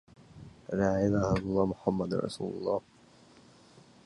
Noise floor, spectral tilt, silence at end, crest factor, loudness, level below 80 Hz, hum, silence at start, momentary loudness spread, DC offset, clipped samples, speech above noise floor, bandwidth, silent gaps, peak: -58 dBFS; -7.5 dB/octave; 1.25 s; 20 dB; -31 LUFS; -52 dBFS; none; 0.35 s; 14 LU; under 0.1%; under 0.1%; 29 dB; 11.5 kHz; none; -12 dBFS